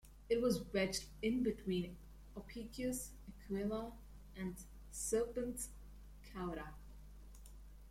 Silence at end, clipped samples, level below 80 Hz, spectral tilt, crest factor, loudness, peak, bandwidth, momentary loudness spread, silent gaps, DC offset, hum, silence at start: 0 s; under 0.1%; -56 dBFS; -4.5 dB/octave; 18 dB; -42 LUFS; -24 dBFS; 16.5 kHz; 21 LU; none; under 0.1%; 50 Hz at -55 dBFS; 0.05 s